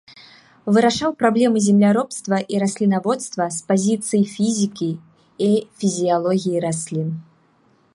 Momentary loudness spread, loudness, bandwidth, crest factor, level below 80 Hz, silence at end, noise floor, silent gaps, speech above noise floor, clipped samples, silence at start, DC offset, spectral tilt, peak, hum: 9 LU; -19 LUFS; 11.5 kHz; 18 dB; -62 dBFS; 0.7 s; -58 dBFS; none; 40 dB; under 0.1%; 0.65 s; under 0.1%; -5.5 dB/octave; -2 dBFS; none